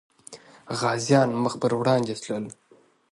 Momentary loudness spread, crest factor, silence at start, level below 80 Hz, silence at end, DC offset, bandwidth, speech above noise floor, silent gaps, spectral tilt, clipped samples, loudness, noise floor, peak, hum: 22 LU; 20 dB; 0.3 s; -68 dBFS; 0.6 s; under 0.1%; 11.5 kHz; 24 dB; none; -5.5 dB/octave; under 0.1%; -24 LUFS; -48 dBFS; -6 dBFS; none